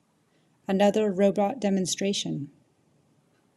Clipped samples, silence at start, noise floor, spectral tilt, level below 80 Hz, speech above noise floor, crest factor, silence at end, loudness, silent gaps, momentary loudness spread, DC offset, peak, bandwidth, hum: under 0.1%; 0.7 s; -67 dBFS; -5 dB/octave; -72 dBFS; 42 dB; 18 dB; 1.1 s; -25 LUFS; none; 13 LU; under 0.1%; -8 dBFS; 12.5 kHz; none